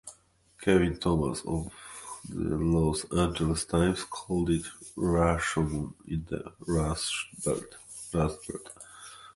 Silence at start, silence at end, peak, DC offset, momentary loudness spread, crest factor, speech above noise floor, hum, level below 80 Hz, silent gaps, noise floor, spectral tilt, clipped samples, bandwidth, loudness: 0.05 s; 0.05 s; -10 dBFS; under 0.1%; 16 LU; 20 dB; 32 dB; none; -42 dBFS; none; -60 dBFS; -5.5 dB/octave; under 0.1%; 11.5 kHz; -29 LUFS